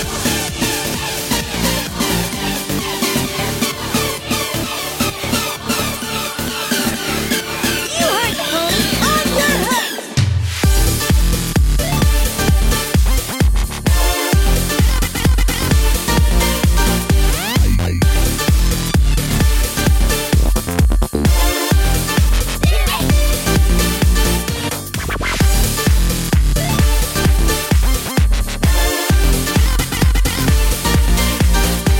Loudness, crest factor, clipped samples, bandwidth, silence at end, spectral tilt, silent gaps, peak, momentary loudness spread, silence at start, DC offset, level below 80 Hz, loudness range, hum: -16 LUFS; 12 dB; under 0.1%; 17 kHz; 0 s; -4 dB/octave; none; -2 dBFS; 4 LU; 0 s; under 0.1%; -18 dBFS; 3 LU; none